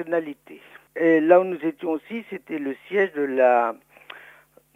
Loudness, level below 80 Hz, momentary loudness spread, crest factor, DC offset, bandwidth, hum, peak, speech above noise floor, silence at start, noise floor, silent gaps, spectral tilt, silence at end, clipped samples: -22 LUFS; -74 dBFS; 24 LU; 20 dB; under 0.1%; 15 kHz; none; -2 dBFS; 31 dB; 0 s; -53 dBFS; none; -7.5 dB/octave; 0.55 s; under 0.1%